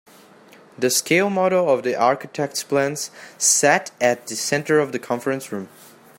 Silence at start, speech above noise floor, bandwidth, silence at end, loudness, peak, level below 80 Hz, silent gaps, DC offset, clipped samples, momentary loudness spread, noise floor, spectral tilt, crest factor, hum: 0.8 s; 28 dB; 16.5 kHz; 0.5 s; -20 LUFS; -2 dBFS; -70 dBFS; none; under 0.1%; under 0.1%; 11 LU; -48 dBFS; -3 dB/octave; 20 dB; none